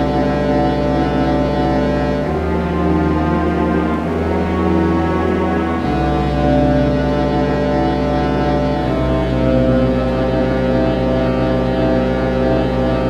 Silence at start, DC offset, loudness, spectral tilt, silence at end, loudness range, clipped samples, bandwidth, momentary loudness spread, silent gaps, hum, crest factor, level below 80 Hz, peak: 0 s; under 0.1%; -16 LUFS; -8.5 dB/octave; 0 s; 1 LU; under 0.1%; 9.8 kHz; 3 LU; none; none; 14 dB; -26 dBFS; -2 dBFS